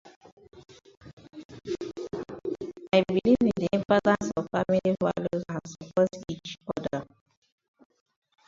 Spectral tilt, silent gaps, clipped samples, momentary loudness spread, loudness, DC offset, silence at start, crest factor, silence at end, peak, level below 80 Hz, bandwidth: -6.5 dB/octave; 0.16-0.21 s, 0.32-0.37 s, 0.97-1.01 s, 1.13-1.17 s, 1.45-1.49 s; under 0.1%; 14 LU; -28 LUFS; under 0.1%; 0.05 s; 22 dB; 1.45 s; -8 dBFS; -60 dBFS; 7.8 kHz